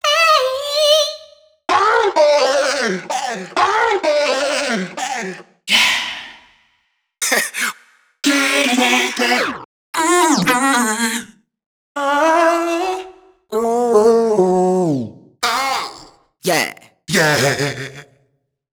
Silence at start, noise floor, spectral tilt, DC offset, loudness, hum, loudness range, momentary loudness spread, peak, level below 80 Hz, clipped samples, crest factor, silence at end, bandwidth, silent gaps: 0.05 s; -66 dBFS; -3 dB/octave; under 0.1%; -16 LUFS; none; 3 LU; 12 LU; 0 dBFS; -58 dBFS; under 0.1%; 16 dB; 0.7 s; over 20 kHz; 9.65-9.93 s, 11.66-11.95 s